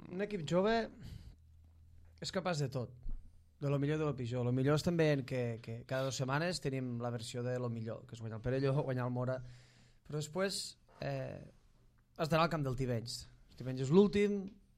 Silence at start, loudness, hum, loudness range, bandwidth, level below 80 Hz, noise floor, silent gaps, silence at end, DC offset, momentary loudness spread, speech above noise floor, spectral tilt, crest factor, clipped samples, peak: 0 s; -36 LUFS; none; 5 LU; 15 kHz; -56 dBFS; -67 dBFS; none; 0.25 s; under 0.1%; 14 LU; 31 dB; -6 dB/octave; 22 dB; under 0.1%; -14 dBFS